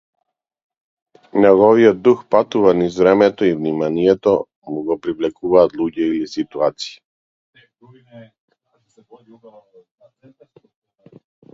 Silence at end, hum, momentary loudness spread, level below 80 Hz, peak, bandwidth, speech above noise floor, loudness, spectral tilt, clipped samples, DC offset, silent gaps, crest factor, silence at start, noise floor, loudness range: 3.3 s; none; 12 LU; -56 dBFS; 0 dBFS; 7.6 kHz; 44 dB; -16 LUFS; -7 dB/octave; under 0.1%; under 0.1%; 4.56-4.62 s, 7.05-7.53 s; 18 dB; 1.35 s; -60 dBFS; 12 LU